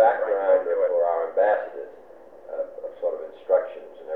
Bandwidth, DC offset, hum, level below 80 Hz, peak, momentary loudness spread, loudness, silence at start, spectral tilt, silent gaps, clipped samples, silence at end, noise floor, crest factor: 3.9 kHz; 0.2%; none; -72 dBFS; -6 dBFS; 16 LU; -24 LUFS; 0 s; -6 dB/octave; none; under 0.1%; 0 s; -47 dBFS; 18 dB